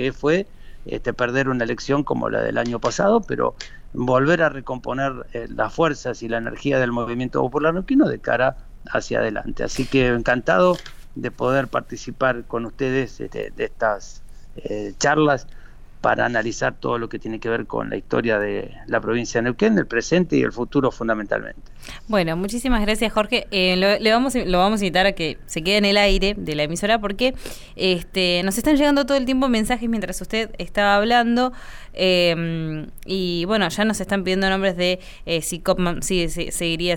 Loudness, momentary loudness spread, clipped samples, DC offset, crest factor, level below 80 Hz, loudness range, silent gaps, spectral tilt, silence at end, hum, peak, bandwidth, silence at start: -21 LUFS; 11 LU; under 0.1%; under 0.1%; 16 dB; -36 dBFS; 4 LU; none; -4.5 dB/octave; 0 s; none; -4 dBFS; 19.5 kHz; 0 s